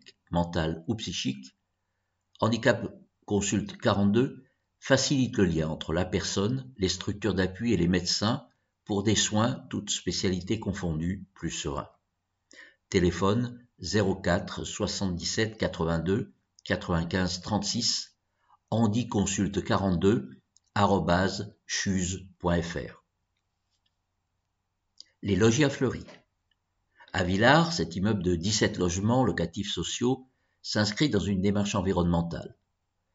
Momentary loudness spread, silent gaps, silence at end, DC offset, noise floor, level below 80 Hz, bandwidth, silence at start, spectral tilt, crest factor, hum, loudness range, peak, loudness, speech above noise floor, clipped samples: 10 LU; none; 0.65 s; under 0.1%; -80 dBFS; -50 dBFS; 8 kHz; 0.3 s; -4.5 dB/octave; 22 dB; none; 5 LU; -6 dBFS; -28 LUFS; 52 dB; under 0.1%